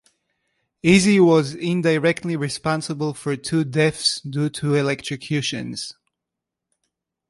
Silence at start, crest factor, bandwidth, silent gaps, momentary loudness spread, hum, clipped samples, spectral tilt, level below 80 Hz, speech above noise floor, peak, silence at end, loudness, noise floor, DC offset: 0.85 s; 18 dB; 11.5 kHz; none; 12 LU; none; under 0.1%; -5 dB/octave; -56 dBFS; 64 dB; -4 dBFS; 1.4 s; -20 LUFS; -84 dBFS; under 0.1%